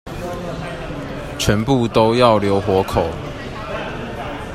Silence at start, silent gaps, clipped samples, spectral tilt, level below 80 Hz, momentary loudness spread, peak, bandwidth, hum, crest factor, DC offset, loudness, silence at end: 0.05 s; none; under 0.1%; -5.5 dB/octave; -36 dBFS; 14 LU; 0 dBFS; 15 kHz; none; 18 dB; under 0.1%; -19 LUFS; 0 s